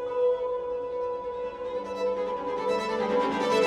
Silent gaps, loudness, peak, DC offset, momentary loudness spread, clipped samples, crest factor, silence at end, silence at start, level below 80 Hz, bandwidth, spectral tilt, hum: none; -29 LUFS; -12 dBFS; under 0.1%; 7 LU; under 0.1%; 16 dB; 0 s; 0 s; -60 dBFS; 11 kHz; -4.5 dB/octave; none